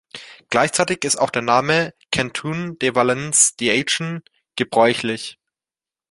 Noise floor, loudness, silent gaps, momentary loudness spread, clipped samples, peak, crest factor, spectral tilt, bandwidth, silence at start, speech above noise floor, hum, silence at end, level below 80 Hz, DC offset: under -90 dBFS; -19 LUFS; none; 14 LU; under 0.1%; 0 dBFS; 20 dB; -2.5 dB/octave; 11.5 kHz; 0.15 s; over 71 dB; none; 0.8 s; -56 dBFS; under 0.1%